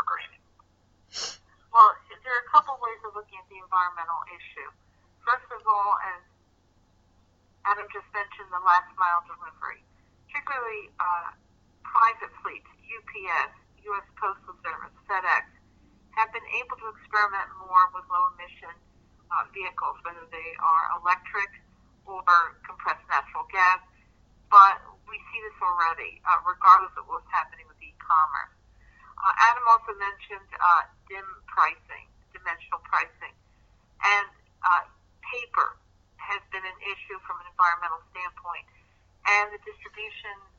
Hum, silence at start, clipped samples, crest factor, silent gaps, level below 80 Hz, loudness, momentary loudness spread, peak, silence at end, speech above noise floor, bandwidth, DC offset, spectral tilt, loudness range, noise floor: none; 0 s; under 0.1%; 24 dB; none; -62 dBFS; -25 LUFS; 20 LU; -2 dBFS; 0.25 s; 38 dB; 7.8 kHz; under 0.1%; -1 dB/octave; 8 LU; -64 dBFS